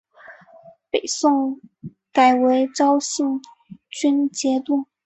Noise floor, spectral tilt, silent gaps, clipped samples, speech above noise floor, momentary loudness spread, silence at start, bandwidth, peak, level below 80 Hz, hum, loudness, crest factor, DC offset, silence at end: -48 dBFS; -3 dB/octave; none; under 0.1%; 29 dB; 15 LU; 0.3 s; 8.4 kHz; -2 dBFS; -68 dBFS; none; -20 LUFS; 18 dB; under 0.1%; 0.2 s